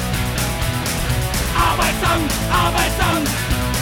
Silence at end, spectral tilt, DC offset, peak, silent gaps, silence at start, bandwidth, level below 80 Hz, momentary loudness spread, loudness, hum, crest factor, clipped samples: 0 s; -4 dB/octave; under 0.1%; -4 dBFS; none; 0 s; 19 kHz; -26 dBFS; 4 LU; -18 LUFS; none; 14 dB; under 0.1%